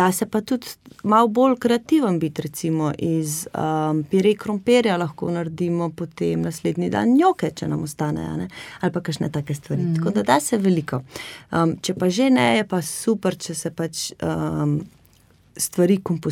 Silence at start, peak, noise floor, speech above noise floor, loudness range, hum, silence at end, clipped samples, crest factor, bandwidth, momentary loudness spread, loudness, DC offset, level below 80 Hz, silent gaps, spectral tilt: 0 s; -2 dBFS; -55 dBFS; 34 dB; 3 LU; none; 0 s; under 0.1%; 20 dB; 17 kHz; 10 LU; -22 LUFS; under 0.1%; -56 dBFS; none; -5.5 dB/octave